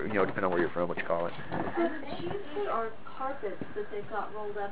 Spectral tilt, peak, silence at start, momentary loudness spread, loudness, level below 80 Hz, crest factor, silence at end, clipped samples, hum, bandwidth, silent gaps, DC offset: -4.5 dB/octave; -14 dBFS; 0 s; 9 LU; -34 LUFS; -60 dBFS; 20 dB; 0 s; under 0.1%; none; 4 kHz; none; 2%